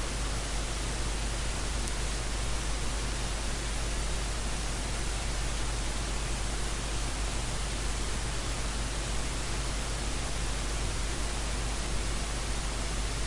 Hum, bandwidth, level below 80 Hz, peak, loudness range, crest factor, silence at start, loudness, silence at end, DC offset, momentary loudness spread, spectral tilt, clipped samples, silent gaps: none; 11.5 kHz; -34 dBFS; -12 dBFS; 0 LU; 20 dB; 0 s; -34 LUFS; 0 s; under 0.1%; 0 LU; -3 dB/octave; under 0.1%; none